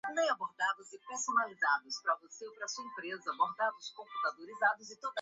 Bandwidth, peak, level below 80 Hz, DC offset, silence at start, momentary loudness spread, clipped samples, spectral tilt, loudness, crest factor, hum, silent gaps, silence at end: 8 kHz; -16 dBFS; -90 dBFS; under 0.1%; 0.05 s; 11 LU; under 0.1%; 1.5 dB/octave; -35 LUFS; 20 dB; none; none; 0 s